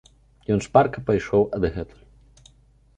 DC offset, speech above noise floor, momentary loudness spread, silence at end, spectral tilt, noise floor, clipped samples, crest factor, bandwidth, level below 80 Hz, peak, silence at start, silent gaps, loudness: under 0.1%; 35 dB; 17 LU; 1.15 s; -7 dB/octave; -56 dBFS; under 0.1%; 22 dB; 9.2 kHz; -44 dBFS; -2 dBFS; 0.5 s; none; -22 LUFS